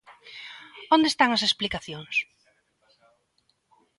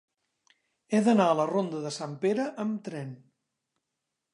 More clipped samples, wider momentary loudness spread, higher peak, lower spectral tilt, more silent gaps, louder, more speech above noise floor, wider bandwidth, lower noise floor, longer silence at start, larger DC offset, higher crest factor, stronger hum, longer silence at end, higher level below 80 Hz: neither; first, 21 LU vs 15 LU; first, -6 dBFS vs -10 dBFS; second, -3 dB/octave vs -6 dB/octave; neither; first, -23 LUFS vs -28 LUFS; second, 47 dB vs 57 dB; about the same, 11.5 kHz vs 11 kHz; second, -71 dBFS vs -85 dBFS; second, 0.1 s vs 0.9 s; neither; about the same, 22 dB vs 20 dB; neither; first, 1.75 s vs 1.15 s; first, -60 dBFS vs -82 dBFS